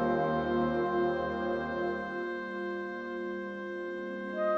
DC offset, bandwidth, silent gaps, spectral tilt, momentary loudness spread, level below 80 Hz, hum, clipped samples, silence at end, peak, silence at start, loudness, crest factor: under 0.1%; 6.4 kHz; none; -8 dB/octave; 8 LU; -58 dBFS; none; under 0.1%; 0 s; -18 dBFS; 0 s; -33 LUFS; 14 dB